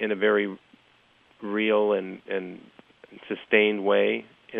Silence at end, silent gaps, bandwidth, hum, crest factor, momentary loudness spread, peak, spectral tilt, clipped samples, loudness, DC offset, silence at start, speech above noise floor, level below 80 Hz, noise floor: 0 s; none; 3.9 kHz; none; 22 dB; 15 LU; -4 dBFS; -7.5 dB/octave; under 0.1%; -25 LUFS; under 0.1%; 0 s; 36 dB; -78 dBFS; -61 dBFS